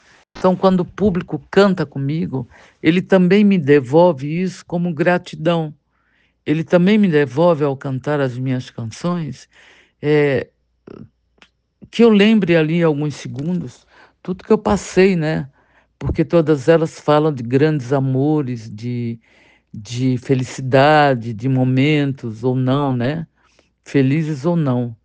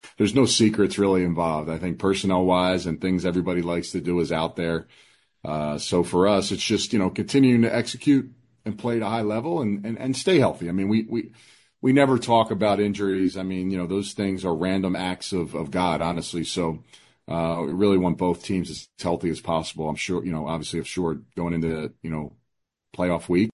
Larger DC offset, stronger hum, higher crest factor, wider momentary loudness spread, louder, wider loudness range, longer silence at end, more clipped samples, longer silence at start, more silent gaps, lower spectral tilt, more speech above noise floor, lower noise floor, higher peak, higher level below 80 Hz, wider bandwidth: neither; neither; about the same, 18 dB vs 18 dB; first, 14 LU vs 10 LU; first, -17 LUFS vs -24 LUFS; about the same, 4 LU vs 5 LU; about the same, 0.1 s vs 0.05 s; neither; first, 0.35 s vs 0.05 s; neither; first, -7.5 dB/octave vs -5.5 dB/octave; second, 45 dB vs 55 dB; second, -61 dBFS vs -78 dBFS; first, 0 dBFS vs -6 dBFS; about the same, -46 dBFS vs -48 dBFS; second, 9.2 kHz vs 11.5 kHz